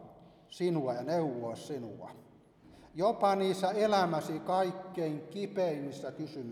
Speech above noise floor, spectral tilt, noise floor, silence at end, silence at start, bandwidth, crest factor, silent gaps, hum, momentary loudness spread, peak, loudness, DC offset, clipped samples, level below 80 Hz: 26 dB; -6 dB/octave; -59 dBFS; 0 s; 0 s; 15 kHz; 18 dB; none; none; 13 LU; -16 dBFS; -33 LUFS; under 0.1%; under 0.1%; -72 dBFS